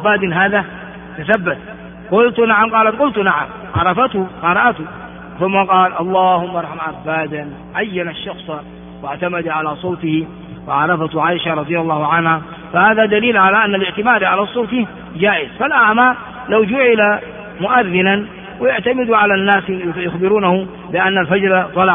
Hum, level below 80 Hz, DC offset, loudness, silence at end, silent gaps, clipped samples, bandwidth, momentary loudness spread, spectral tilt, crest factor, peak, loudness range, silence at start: none; -48 dBFS; under 0.1%; -15 LUFS; 0 s; none; under 0.1%; 3.8 kHz; 15 LU; -3 dB/octave; 16 dB; 0 dBFS; 7 LU; 0 s